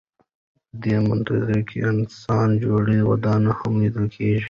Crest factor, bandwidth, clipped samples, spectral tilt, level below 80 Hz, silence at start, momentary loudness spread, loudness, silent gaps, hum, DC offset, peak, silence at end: 14 dB; 7 kHz; under 0.1%; -9 dB/octave; -48 dBFS; 0.75 s; 5 LU; -21 LUFS; none; none; under 0.1%; -8 dBFS; 0 s